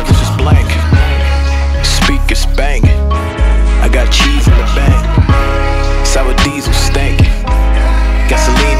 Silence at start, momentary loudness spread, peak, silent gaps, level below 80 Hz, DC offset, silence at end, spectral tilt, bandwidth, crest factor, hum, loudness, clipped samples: 0 s; 3 LU; 0 dBFS; none; -10 dBFS; under 0.1%; 0 s; -5 dB/octave; 14 kHz; 8 dB; none; -11 LUFS; under 0.1%